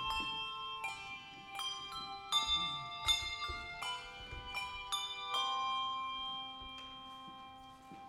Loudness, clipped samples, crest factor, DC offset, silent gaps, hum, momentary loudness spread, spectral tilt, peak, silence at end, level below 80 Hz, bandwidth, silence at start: -38 LUFS; under 0.1%; 22 dB; under 0.1%; none; none; 16 LU; -0.5 dB/octave; -20 dBFS; 0 s; -60 dBFS; 16 kHz; 0 s